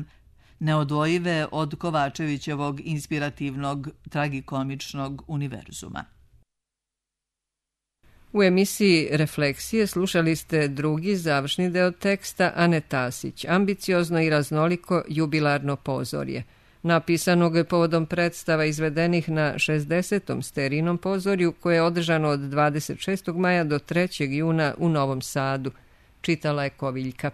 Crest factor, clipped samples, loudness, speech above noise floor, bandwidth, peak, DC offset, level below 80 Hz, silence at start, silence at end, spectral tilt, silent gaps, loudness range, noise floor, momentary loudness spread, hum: 18 dB; under 0.1%; -24 LUFS; 63 dB; 13.5 kHz; -6 dBFS; under 0.1%; -56 dBFS; 0 s; 0 s; -5.5 dB/octave; none; 7 LU; -87 dBFS; 9 LU; none